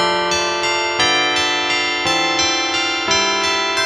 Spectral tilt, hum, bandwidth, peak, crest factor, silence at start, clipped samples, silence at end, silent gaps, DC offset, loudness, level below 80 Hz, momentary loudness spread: -1 dB/octave; none; 14 kHz; -2 dBFS; 14 dB; 0 s; under 0.1%; 0 s; none; under 0.1%; -16 LUFS; -50 dBFS; 3 LU